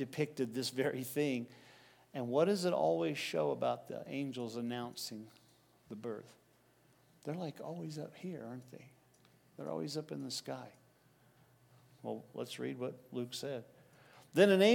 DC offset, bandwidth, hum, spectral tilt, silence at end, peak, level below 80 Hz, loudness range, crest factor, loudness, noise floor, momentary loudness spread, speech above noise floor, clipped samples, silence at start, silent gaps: under 0.1%; 18 kHz; none; -5 dB/octave; 0 s; -14 dBFS; -86 dBFS; 11 LU; 24 dB; -38 LUFS; -69 dBFS; 17 LU; 33 dB; under 0.1%; 0 s; none